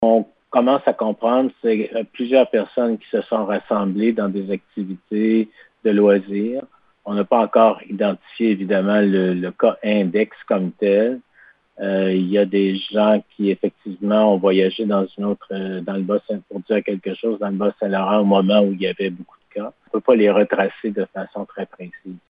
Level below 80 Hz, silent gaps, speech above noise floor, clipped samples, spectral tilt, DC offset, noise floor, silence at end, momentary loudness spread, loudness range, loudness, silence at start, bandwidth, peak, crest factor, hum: -70 dBFS; none; 34 dB; under 0.1%; -10 dB/octave; under 0.1%; -53 dBFS; 0.1 s; 12 LU; 3 LU; -19 LUFS; 0 s; 5 kHz; 0 dBFS; 18 dB; none